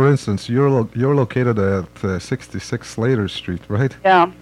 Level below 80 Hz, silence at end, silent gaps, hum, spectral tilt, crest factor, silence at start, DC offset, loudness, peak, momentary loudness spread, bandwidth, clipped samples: -50 dBFS; 0.05 s; none; none; -7 dB/octave; 16 dB; 0 s; under 0.1%; -19 LUFS; -2 dBFS; 12 LU; 11.5 kHz; under 0.1%